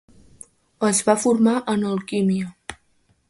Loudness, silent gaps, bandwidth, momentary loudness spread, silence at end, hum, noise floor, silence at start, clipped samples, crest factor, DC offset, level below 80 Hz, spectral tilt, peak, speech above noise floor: -20 LUFS; none; 11.5 kHz; 14 LU; 0.55 s; none; -63 dBFS; 0.8 s; under 0.1%; 20 dB; under 0.1%; -58 dBFS; -5 dB/octave; -4 dBFS; 43 dB